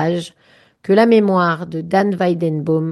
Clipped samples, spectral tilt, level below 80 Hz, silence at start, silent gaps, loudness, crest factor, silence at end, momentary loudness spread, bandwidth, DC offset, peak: under 0.1%; -7.5 dB/octave; -60 dBFS; 0 s; none; -16 LUFS; 14 dB; 0 s; 12 LU; 12 kHz; under 0.1%; -2 dBFS